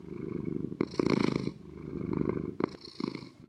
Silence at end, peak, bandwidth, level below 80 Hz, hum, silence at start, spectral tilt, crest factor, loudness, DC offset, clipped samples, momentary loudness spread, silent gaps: 0.05 s; -10 dBFS; 10.5 kHz; -58 dBFS; none; 0 s; -7.5 dB/octave; 24 dB; -34 LUFS; under 0.1%; under 0.1%; 10 LU; none